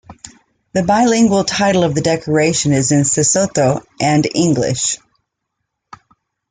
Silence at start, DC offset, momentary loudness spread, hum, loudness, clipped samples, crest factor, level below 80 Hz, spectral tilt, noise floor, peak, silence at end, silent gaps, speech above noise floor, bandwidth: 0.1 s; under 0.1%; 6 LU; none; -14 LUFS; under 0.1%; 14 dB; -48 dBFS; -4.5 dB/octave; -75 dBFS; -2 dBFS; 1.55 s; none; 61 dB; 9.6 kHz